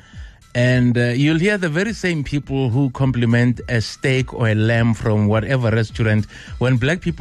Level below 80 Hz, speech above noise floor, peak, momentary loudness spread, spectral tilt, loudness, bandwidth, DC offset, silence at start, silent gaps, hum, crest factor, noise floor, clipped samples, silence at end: -38 dBFS; 21 dB; -6 dBFS; 5 LU; -7 dB/octave; -18 LUFS; 10.5 kHz; under 0.1%; 0.15 s; none; none; 10 dB; -38 dBFS; under 0.1%; 0 s